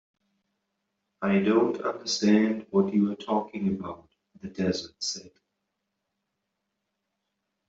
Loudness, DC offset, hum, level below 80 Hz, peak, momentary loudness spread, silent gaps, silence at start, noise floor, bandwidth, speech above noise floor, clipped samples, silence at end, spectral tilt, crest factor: -26 LUFS; under 0.1%; none; -68 dBFS; -8 dBFS; 16 LU; none; 1.2 s; -82 dBFS; 8 kHz; 56 dB; under 0.1%; 2.4 s; -5.5 dB/octave; 20 dB